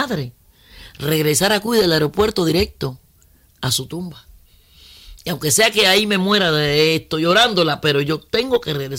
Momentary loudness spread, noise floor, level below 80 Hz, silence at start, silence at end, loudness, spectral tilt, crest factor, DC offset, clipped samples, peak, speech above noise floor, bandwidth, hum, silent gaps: 14 LU; -53 dBFS; -44 dBFS; 0 s; 0 s; -17 LUFS; -3.5 dB/octave; 14 dB; under 0.1%; under 0.1%; -4 dBFS; 36 dB; 16.5 kHz; none; none